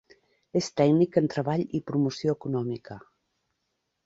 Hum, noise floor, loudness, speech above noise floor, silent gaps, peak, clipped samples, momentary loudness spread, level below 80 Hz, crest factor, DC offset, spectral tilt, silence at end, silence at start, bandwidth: none; -79 dBFS; -27 LUFS; 53 dB; none; -8 dBFS; under 0.1%; 13 LU; -64 dBFS; 20 dB; under 0.1%; -7 dB/octave; 1.05 s; 0.55 s; 8 kHz